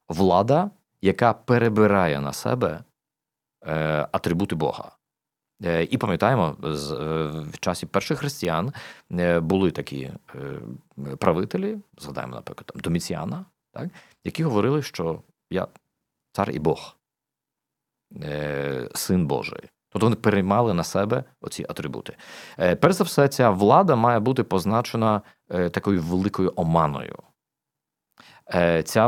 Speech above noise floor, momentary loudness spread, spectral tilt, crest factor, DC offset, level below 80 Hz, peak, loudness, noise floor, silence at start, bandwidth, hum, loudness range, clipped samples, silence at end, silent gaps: 64 dB; 17 LU; -6.5 dB/octave; 24 dB; under 0.1%; -56 dBFS; 0 dBFS; -23 LUFS; -87 dBFS; 0.1 s; 16.5 kHz; none; 8 LU; under 0.1%; 0 s; none